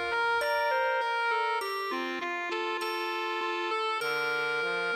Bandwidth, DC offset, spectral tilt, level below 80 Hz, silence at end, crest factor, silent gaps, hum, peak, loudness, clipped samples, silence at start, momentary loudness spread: 16 kHz; under 0.1%; -2.5 dB/octave; -72 dBFS; 0 s; 12 dB; none; none; -18 dBFS; -30 LUFS; under 0.1%; 0 s; 5 LU